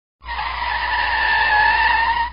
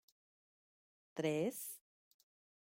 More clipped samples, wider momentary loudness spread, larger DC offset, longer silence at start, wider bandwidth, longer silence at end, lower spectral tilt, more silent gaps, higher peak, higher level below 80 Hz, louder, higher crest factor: neither; second, 11 LU vs 14 LU; first, 0.5% vs under 0.1%; second, 0.25 s vs 1.15 s; second, 5.4 kHz vs 16.5 kHz; second, 0 s vs 0.85 s; second, 1.5 dB/octave vs -5 dB/octave; neither; first, -6 dBFS vs -24 dBFS; first, -36 dBFS vs -88 dBFS; first, -17 LUFS vs -41 LUFS; second, 12 dB vs 22 dB